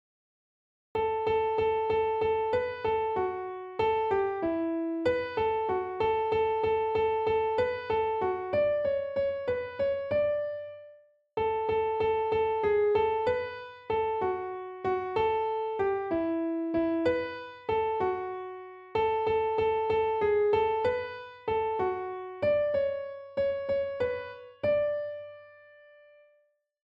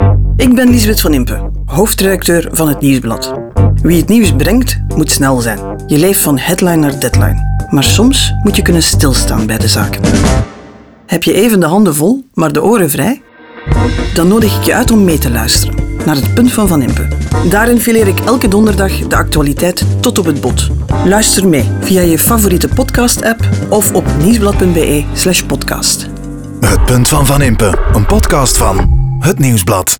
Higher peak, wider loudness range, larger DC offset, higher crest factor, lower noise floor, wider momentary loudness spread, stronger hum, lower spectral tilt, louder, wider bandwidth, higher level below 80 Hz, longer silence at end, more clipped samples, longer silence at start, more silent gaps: second, -14 dBFS vs 0 dBFS; about the same, 2 LU vs 1 LU; neither; first, 16 dB vs 10 dB; first, -70 dBFS vs -35 dBFS; first, 10 LU vs 6 LU; neither; first, -7.5 dB/octave vs -5 dB/octave; second, -29 LUFS vs -10 LUFS; second, 5.6 kHz vs over 20 kHz; second, -60 dBFS vs -18 dBFS; first, 1.45 s vs 0.05 s; neither; first, 0.95 s vs 0 s; neither